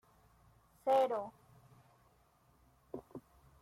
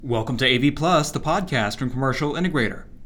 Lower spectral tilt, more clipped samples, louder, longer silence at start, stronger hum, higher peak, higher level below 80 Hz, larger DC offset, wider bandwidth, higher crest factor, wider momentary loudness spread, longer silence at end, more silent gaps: about the same, -5.5 dB/octave vs -5 dB/octave; neither; second, -35 LUFS vs -22 LUFS; first, 0.85 s vs 0 s; neither; second, -22 dBFS vs -4 dBFS; second, -74 dBFS vs -40 dBFS; neither; second, 15.5 kHz vs 18 kHz; about the same, 20 dB vs 18 dB; first, 22 LU vs 6 LU; first, 0.4 s vs 0 s; neither